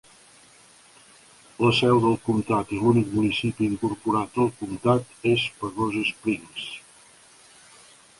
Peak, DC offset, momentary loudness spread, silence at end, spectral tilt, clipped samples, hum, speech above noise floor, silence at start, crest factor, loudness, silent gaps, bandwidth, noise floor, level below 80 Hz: -6 dBFS; under 0.1%; 9 LU; 1.4 s; -6 dB/octave; under 0.1%; none; 30 dB; 1.6 s; 20 dB; -24 LUFS; none; 11.5 kHz; -53 dBFS; -56 dBFS